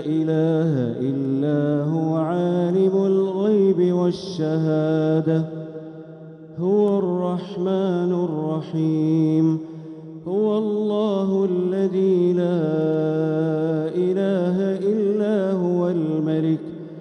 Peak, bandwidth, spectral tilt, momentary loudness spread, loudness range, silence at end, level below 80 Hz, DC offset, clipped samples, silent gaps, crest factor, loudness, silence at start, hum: -8 dBFS; 8.8 kHz; -9.5 dB/octave; 8 LU; 3 LU; 0 s; -68 dBFS; under 0.1%; under 0.1%; none; 12 dB; -21 LUFS; 0 s; none